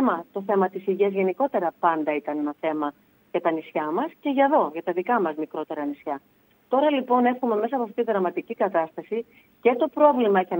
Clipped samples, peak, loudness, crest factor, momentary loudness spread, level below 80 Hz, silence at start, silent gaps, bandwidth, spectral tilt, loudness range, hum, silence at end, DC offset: under 0.1%; -6 dBFS; -24 LUFS; 18 dB; 10 LU; -78 dBFS; 0 s; none; 16 kHz; -8.5 dB/octave; 2 LU; none; 0 s; under 0.1%